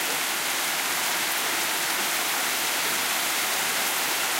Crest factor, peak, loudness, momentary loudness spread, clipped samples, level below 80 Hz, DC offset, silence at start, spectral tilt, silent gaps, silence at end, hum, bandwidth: 14 dB; -12 dBFS; -23 LUFS; 1 LU; under 0.1%; -68 dBFS; under 0.1%; 0 s; 1 dB/octave; none; 0 s; none; 16 kHz